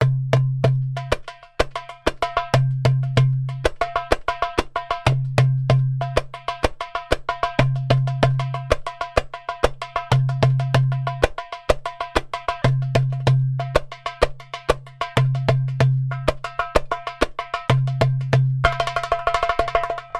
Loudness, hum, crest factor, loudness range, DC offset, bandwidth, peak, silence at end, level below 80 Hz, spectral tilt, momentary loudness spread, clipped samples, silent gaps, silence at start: -22 LUFS; none; 20 dB; 1 LU; under 0.1%; 11 kHz; 0 dBFS; 0 s; -34 dBFS; -6.5 dB/octave; 6 LU; under 0.1%; none; 0 s